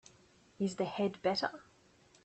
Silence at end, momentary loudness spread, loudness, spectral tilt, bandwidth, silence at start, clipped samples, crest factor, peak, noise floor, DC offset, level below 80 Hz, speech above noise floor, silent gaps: 0.6 s; 6 LU; -36 LUFS; -5 dB/octave; 8.4 kHz; 0.6 s; under 0.1%; 18 dB; -20 dBFS; -65 dBFS; under 0.1%; -74 dBFS; 30 dB; none